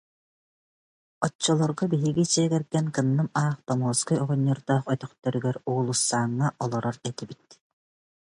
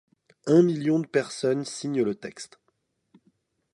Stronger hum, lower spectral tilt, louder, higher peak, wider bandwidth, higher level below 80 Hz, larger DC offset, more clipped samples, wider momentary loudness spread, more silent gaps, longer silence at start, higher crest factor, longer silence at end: neither; about the same, -5 dB/octave vs -6 dB/octave; about the same, -26 LUFS vs -25 LUFS; about the same, -8 dBFS vs -8 dBFS; about the same, 11.5 kHz vs 11.5 kHz; first, -64 dBFS vs -74 dBFS; neither; neither; second, 7 LU vs 18 LU; first, 1.35-1.39 s vs none; first, 1.2 s vs 0.45 s; about the same, 20 dB vs 20 dB; second, 0.95 s vs 1.3 s